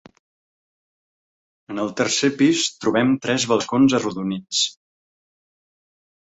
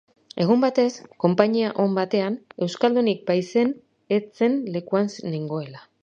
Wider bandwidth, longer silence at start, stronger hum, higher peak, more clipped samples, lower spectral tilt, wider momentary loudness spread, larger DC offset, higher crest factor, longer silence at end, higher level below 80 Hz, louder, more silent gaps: about the same, 8.2 kHz vs 7.8 kHz; first, 1.7 s vs 0.35 s; neither; about the same, -4 dBFS vs -2 dBFS; neither; second, -3.5 dB/octave vs -6.5 dB/octave; about the same, 9 LU vs 10 LU; neither; about the same, 18 dB vs 22 dB; first, 1.5 s vs 0.25 s; first, -62 dBFS vs -72 dBFS; first, -20 LUFS vs -23 LUFS; neither